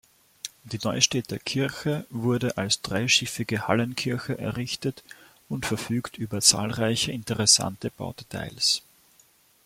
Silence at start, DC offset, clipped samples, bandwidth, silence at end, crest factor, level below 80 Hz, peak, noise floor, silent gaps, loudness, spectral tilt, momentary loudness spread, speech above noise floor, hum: 0.45 s; under 0.1%; under 0.1%; 16.5 kHz; 0.85 s; 24 dB; -58 dBFS; -2 dBFS; -60 dBFS; none; -25 LUFS; -3 dB/octave; 16 LU; 34 dB; none